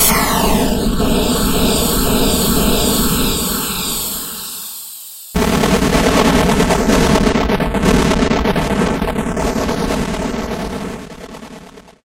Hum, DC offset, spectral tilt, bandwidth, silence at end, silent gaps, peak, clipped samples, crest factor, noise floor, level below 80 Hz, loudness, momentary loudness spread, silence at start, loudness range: none; under 0.1%; -4 dB/octave; 16.5 kHz; 0.25 s; none; 0 dBFS; under 0.1%; 16 dB; -37 dBFS; -24 dBFS; -15 LUFS; 13 LU; 0 s; 5 LU